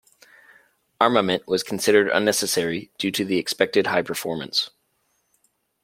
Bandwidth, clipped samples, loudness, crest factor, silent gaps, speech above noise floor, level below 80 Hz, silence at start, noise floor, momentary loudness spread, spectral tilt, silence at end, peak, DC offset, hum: 16.5 kHz; under 0.1%; -22 LUFS; 22 dB; none; 48 dB; -66 dBFS; 1 s; -70 dBFS; 8 LU; -3 dB/octave; 1.15 s; -2 dBFS; under 0.1%; none